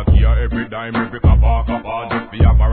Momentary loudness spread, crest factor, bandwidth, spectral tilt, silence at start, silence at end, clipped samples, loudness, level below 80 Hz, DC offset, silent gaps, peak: 9 LU; 14 dB; 4.4 kHz; -11.5 dB/octave; 0 s; 0 s; under 0.1%; -17 LUFS; -16 dBFS; 0.4%; none; 0 dBFS